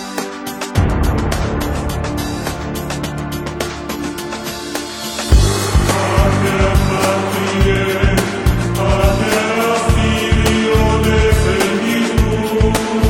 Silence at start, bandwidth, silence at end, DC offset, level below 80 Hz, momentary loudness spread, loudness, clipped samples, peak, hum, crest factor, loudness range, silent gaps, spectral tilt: 0 s; 17 kHz; 0 s; under 0.1%; -20 dBFS; 10 LU; -16 LUFS; under 0.1%; 0 dBFS; none; 14 dB; 7 LU; none; -5 dB/octave